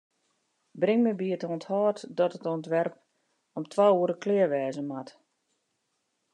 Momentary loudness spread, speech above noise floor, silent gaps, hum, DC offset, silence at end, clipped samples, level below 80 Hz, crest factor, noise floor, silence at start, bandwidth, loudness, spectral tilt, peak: 13 LU; 51 dB; none; none; under 0.1%; 1.25 s; under 0.1%; under -90 dBFS; 18 dB; -78 dBFS; 0.75 s; 10 kHz; -28 LUFS; -7 dB/octave; -10 dBFS